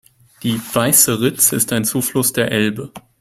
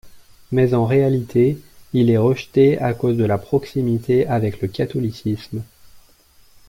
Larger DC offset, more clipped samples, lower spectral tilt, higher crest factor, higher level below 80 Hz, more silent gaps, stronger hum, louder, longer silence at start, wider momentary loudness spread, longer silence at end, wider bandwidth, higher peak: neither; neither; second, -3 dB/octave vs -8.5 dB/octave; about the same, 18 dB vs 16 dB; about the same, -52 dBFS vs -50 dBFS; neither; neither; first, -15 LUFS vs -19 LUFS; first, 0.4 s vs 0.05 s; first, 12 LU vs 9 LU; second, 0.2 s vs 0.7 s; about the same, 16 kHz vs 16 kHz; first, 0 dBFS vs -4 dBFS